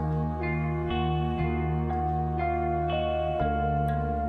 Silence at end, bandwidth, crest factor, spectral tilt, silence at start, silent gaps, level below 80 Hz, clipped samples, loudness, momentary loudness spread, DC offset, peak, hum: 0 s; 4.5 kHz; 12 dB; -9.5 dB/octave; 0 s; none; -36 dBFS; under 0.1%; -28 LUFS; 2 LU; under 0.1%; -14 dBFS; none